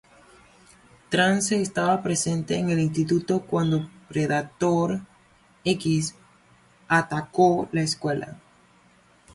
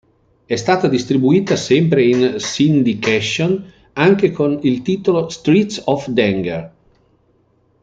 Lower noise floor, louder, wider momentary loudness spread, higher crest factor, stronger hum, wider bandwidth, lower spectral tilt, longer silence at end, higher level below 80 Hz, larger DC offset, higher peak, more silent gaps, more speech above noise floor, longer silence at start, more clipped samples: about the same, -58 dBFS vs -58 dBFS; second, -24 LUFS vs -16 LUFS; about the same, 8 LU vs 7 LU; about the same, 18 dB vs 14 dB; neither; first, 11.5 kHz vs 8.8 kHz; about the same, -5 dB/octave vs -6 dB/octave; second, 0.95 s vs 1.15 s; about the same, -58 dBFS vs -54 dBFS; neither; second, -8 dBFS vs -2 dBFS; neither; second, 35 dB vs 43 dB; first, 1.1 s vs 0.5 s; neither